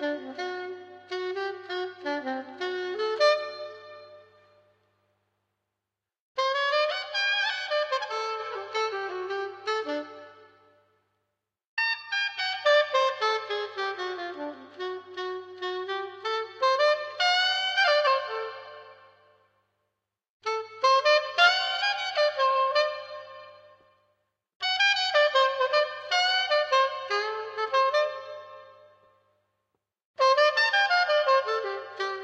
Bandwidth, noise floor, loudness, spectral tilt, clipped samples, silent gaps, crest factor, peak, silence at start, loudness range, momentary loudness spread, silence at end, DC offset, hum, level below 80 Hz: 8.4 kHz; -88 dBFS; -26 LUFS; -0.5 dB/octave; under 0.1%; 6.20-6.35 s, 11.67-11.77 s, 20.30-20.40 s, 24.56-24.60 s, 30.05-30.14 s; 20 dB; -8 dBFS; 0 s; 8 LU; 16 LU; 0 s; under 0.1%; 50 Hz at -75 dBFS; -86 dBFS